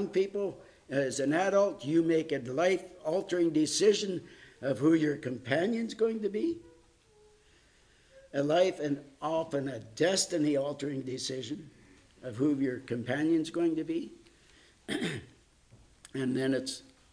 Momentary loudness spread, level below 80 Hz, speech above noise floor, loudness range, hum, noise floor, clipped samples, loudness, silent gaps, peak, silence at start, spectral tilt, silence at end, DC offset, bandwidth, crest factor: 12 LU; -68 dBFS; 33 dB; 5 LU; none; -63 dBFS; under 0.1%; -31 LUFS; none; -12 dBFS; 0 s; -4.5 dB/octave; 0.3 s; under 0.1%; 10.5 kHz; 20 dB